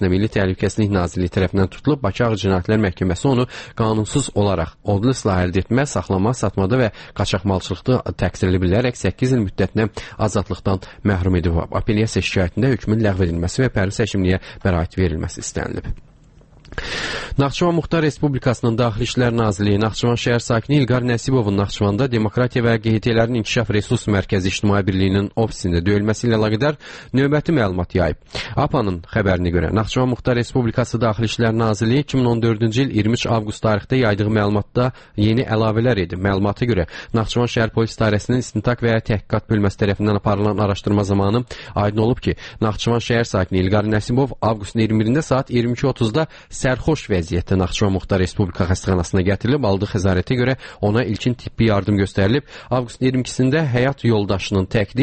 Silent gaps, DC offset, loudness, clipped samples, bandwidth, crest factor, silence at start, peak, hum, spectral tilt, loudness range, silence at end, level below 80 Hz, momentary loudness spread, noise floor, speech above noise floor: none; under 0.1%; -19 LUFS; under 0.1%; 8.8 kHz; 16 dB; 0 s; -4 dBFS; none; -6.5 dB/octave; 2 LU; 0 s; -36 dBFS; 4 LU; -47 dBFS; 29 dB